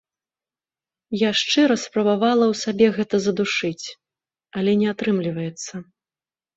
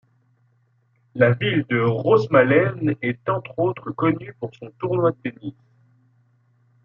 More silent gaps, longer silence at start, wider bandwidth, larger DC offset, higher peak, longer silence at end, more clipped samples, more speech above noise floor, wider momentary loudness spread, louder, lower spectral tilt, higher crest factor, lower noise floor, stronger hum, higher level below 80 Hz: neither; about the same, 1.1 s vs 1.15 s; first, 8 kHz vs 6.6 kHz; neither; about the same, -4 dBFS vs -2 dBFS; second, 0.75 s vs 1.35 s; neither; first, over 70 dB vs 43 dB; second, 15 LU vs 18 LU; about the same, -21 LUFS vs -21 LUFS; second, -4.5 dB/octave vs -9 dB/octave; about the same, 18 dB vs 20 dB; first, under -90 dBFS vs -63 dBFS; neither; about the same, -64 dBFS vs -64 dBFS